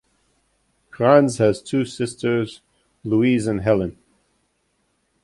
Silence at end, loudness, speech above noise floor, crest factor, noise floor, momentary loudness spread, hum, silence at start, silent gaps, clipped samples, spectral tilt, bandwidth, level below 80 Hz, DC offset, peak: 1.35 s; -20 LUFS; 50 dB; 20 dB; -68 dBFS; 11 LU; none; 0.95 s; none; under 0.1%; -6.5 dB/octave; 11.5 kHz; -52 dBFS; under 0.1%; -2 dBFS